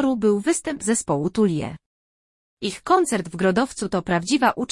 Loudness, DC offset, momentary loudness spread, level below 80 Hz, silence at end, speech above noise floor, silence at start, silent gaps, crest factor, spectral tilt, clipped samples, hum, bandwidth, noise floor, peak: -22 LUFS; under 0.1%; 9 LU; -54 dBFS; 0.05 s; over 69 dB; 0 s; 1.86-2.57 s; 18 dB; -4.5 dB/octave; under 0.1%; none; 12 kHz; under -90 dBFS; -4 dBFS